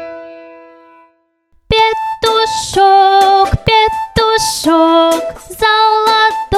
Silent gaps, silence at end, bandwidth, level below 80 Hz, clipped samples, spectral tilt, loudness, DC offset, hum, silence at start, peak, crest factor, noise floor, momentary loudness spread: none; 0 s; 15 kHz; -32 dBFS; under 0.1%; -3.5 dB/octave; -11 LUFS; under 0.1%; none; 0 s; 0 dBFS; 12 dB; -55 dBFS; 7 LU